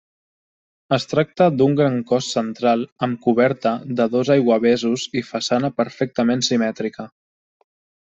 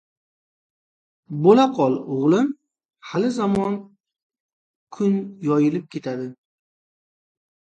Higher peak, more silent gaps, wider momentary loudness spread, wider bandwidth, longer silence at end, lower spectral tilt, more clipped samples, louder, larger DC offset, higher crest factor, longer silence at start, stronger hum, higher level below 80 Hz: about the same, -2 dBFS vs -4 dBFS; second, 2.92-2.96 s vs 4.23-4.30 s, 4.40-4.87 s; second, 7 LU vs 15 LU; second, 8 kHz vs 9 kHz; second, 1 s vs 1.4 s; second, -5.5 dB/octave vs -7.5 dB/octave; neither; about the same, -19 LUFS vs -21 LUFS; neither; about the same, 18 dB vs 20 dB; second, 0.9 s vs 1.3 s; neither; about the same, -62 dBFS vs -62 dBFS